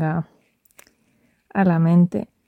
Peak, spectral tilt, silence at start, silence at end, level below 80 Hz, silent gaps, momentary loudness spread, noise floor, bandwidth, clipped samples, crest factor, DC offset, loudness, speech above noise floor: -6 dBFS; -10 dB/octave; 0 s; 0.25 s; -60 dBFS; none; 12 LU; -63 dBFS; 4.3 kHz; under 0.1%; 16 dB; under 0.1%; -19 LUFS; 45 dB